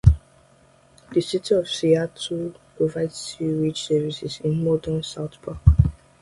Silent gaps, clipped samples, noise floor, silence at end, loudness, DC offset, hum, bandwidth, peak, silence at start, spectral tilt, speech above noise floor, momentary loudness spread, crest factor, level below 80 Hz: none; under 0.1%; -55 dBFS; 0.3 s; -23 LUFS; under 0.1%; none; 11.5 kHz; 0 dBFS; 0.05 s; -6.5 dB/octave; 32 dB; 9 LU; 22 dB; -30 dBFS